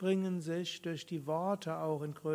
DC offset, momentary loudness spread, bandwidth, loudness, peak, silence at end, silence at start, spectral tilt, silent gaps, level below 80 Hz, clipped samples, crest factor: under 0.1%; 6 LU; 16 kHz; -37 LUFS; -20 dBFS; 0 s; 0 s; -6 dB/octave; none; -82 dBFS; under 0.1%; 16 dB